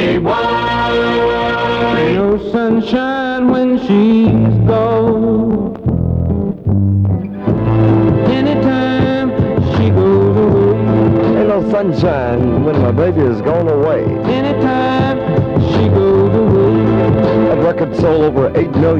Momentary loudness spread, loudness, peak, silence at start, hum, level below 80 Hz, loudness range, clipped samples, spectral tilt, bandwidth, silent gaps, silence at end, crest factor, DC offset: 4 LU; -13 LUFS; -2 dBFS; 0 s; none; -34 dBFS; 2 LU; under 0.1%; -9 dB/octave; 6.8 kHz; none; 0 s; 10 dB; under 0.1%